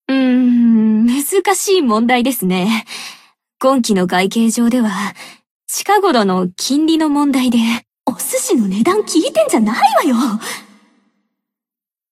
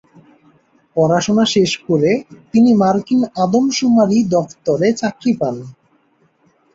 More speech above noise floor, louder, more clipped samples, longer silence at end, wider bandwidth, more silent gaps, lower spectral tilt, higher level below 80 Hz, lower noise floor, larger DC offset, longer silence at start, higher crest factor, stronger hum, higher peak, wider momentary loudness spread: first, 75 dB vs 43 dB; about the same, -14 LUFS vs -15 LUFS; neither; first, 1.5 s vs 1.05 s; first, 15.5 kHz vs 7.8 kHz; first, 5.51-5.60 s vs none; about the same, -4.5 dB/octave vs -5.5 dB/octave; about the same, -58 dBFS vs -56 dBFS; first, -90 dBFS vs -58 dBFS; neither; second, 0.1 s vs 0.95 s; about the same, 14 dB vs 14 dB; neither; about the same, 0 dBFS vs -2 dBFS; first, 10 LU vs 7 LU